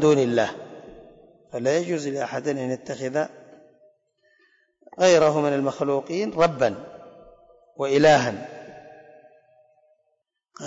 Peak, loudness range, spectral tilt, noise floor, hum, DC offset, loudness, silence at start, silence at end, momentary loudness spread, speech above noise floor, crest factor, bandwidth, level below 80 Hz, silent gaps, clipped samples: -8 dBFS; 6 LU; -5 dB/octave; -74 dBFS; none; under 0.1%; -22 LUFS; 0 s; 0 s; 22 LU; 53 dB; 16 dB; 8 kHz; -62 dBFS; none; under 0.1%